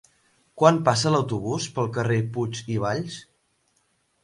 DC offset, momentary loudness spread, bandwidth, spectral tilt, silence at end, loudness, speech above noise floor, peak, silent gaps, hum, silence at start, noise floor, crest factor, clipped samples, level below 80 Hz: under 0.1%; 10 LU; 11.5 kHz; -5.5 dB/octave; 1 s; -24 LUFS; 46 dB; -2 dBFS; none; none; 0.55 s; -69 dBFS; 22 dB; under 0.1%; -58 dBFS